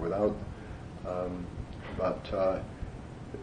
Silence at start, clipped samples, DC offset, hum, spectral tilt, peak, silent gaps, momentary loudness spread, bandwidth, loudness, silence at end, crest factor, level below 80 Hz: 0 s; under 0.1%; under 0.1%; none; -8 dB/octave; -16 dBFS; none; 13 LU; 10 kHz; -35 LUFS; 0 s; 18 dB; -48 dBFS